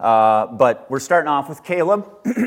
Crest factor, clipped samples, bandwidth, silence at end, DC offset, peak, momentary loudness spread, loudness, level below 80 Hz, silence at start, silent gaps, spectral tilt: 16 dB; under 0.1%; 16.5 kHz; 0 s; under 0.1%; -2 dBFS; 10 LU; -18 LUFS; -66 dBFS; 0 s; none; -5.5 dB/octave